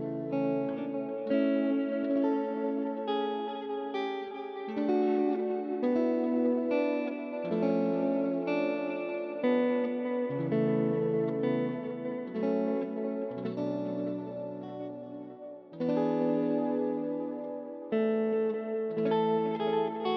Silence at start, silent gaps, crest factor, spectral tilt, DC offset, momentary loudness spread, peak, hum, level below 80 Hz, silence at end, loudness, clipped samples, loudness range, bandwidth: 0 s; none; 14 dB; -9 dB/octave; under 0.1%; 9 LU; -16 dBFS; none; -78 dBFS; 0 s; -31 LUFS; under 0.1%; 4 LU; 6 kHz